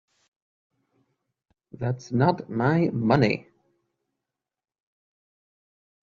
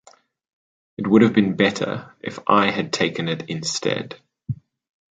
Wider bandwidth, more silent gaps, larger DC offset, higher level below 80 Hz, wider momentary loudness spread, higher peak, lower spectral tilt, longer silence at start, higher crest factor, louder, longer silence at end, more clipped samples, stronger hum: second, 7.2 kHz vs 9.2 kHz; neither; neither; about the same, -60 dBFS vs -60 dBFS; second, 10 LU vs 17 LU; second, -6 dBFS vs -2 dBFS; first, -6.5 dB/octave vs -5 dB/octave; first, 1.8 s vs 1 s; about the same, 22 dB vs 20 dB; second, -24 LUFS vs -20 LUFS; first, 2.7 s vs 0.6 s; neither; neither